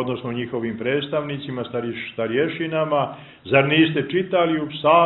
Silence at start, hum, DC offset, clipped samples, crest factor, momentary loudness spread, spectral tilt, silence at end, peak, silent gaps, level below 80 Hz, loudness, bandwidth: 0 s; none; under 0.1%; under 0.1%; 20 dB; 11 LU; -10.5 dB/octave; 0 s; -2 dBFS; none; -60 dBFS; -22 LUFS; 4.2 kHz